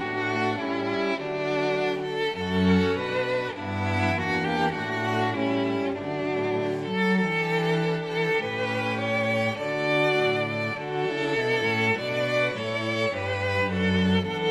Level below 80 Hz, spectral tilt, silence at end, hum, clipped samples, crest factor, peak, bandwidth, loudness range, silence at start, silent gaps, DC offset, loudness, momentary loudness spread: -60 dBFS; -6 dB/octave; 0 s; none; under 0.1%; 14 dB; -10 dBFS; 12.5 kHz; 1 LU; 0 s; none; under 0.1%; -25 LUFS; 5 LU